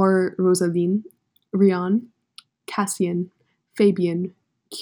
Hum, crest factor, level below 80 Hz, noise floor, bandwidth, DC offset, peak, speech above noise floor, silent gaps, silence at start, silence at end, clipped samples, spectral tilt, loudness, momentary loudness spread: none; 16 dB; -74 dBFS; -52 dBFS; 18.5 kHz; under 0.1%; -6 dBFS; 31 dB; none; 0 s; 0 s; under 0.1%; -6 dB/octave; -22 LUFS; 14 LU